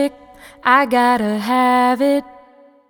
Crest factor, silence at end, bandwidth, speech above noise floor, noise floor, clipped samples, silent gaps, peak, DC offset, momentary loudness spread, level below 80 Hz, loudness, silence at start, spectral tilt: 16 dB; 0.6 s; over 20 kHz; 32 dB; -48 dBFS; under 0.1%; none; 0 dBFS; under 0.1%; 8 LU; -56 dBFS; -16 LUFS; 0 s; -4.5 dB/octave